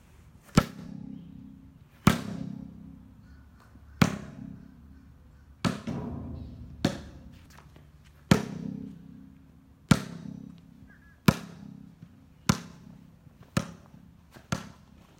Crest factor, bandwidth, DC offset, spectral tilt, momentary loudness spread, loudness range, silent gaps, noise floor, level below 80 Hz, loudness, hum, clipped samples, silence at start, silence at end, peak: 28 dB; 16.5 kHz; under 0.1%; -5.5 dB/octave; 26 LU; 5 LU; none; -55 dBFS; -50 dBFS; -31 LUFS; none; under 0.1%; 0.25 s; 0.45 s; -4 dBFS